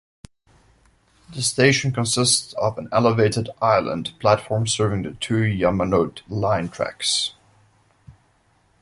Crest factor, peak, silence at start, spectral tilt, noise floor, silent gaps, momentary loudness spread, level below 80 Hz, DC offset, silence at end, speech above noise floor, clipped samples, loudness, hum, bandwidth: 20 dB; -2 dBFS; 1.3 s; -4 dB/octave; -61 dBFS; none; 8 LU; -48 dBFS; under 0.1%; 0.7 s; 41 dB; under 0.1%; -21 LUFS; none; 11.5 kHz